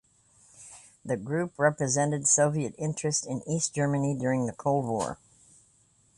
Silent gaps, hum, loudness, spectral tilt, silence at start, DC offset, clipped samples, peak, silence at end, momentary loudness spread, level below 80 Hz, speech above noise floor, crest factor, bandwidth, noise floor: none; none; -28 LUFS; -4.5 dB/octave; 0.6 s; under 0.1%; under 0.1%; -10 dBFS; 1 s; 15 LU; -64 dBFS; 37 dB; 20 dB; 11.5 kHz; -64 dBFS